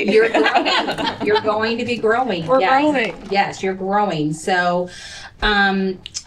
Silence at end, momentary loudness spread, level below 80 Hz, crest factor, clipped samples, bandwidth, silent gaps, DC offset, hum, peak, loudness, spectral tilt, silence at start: 0.05 s; 8 LU; -42 dBFS; 14 dB; under 0.1%; 11.5 kHz; none; under 0.1%; none; -4 dBFS; -18 LUFS; -4.5 dB/octave; 0 s